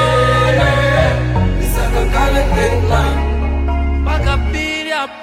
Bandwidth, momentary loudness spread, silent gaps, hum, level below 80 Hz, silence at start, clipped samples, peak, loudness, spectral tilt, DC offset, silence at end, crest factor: 16 kHz; 6 LU; none; none; -18 dBFS; 0 s; under 0.1%; 0 dBFS; -15 LUFS; -6 dB/octave; under 0.1%; 0 s; 14 dB